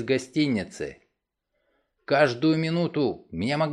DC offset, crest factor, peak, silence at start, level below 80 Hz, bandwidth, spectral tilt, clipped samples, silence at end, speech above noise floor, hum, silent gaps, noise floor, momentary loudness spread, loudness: under 0.1%; 20 dB; -6 dBFS; 0 s; -60 dBFS; 10.5 kHz; -6.5 dB/octave; under 0.1%; 0 s; 54 dB; none; none; -79 dBFS; 12 LU; -25 LUFS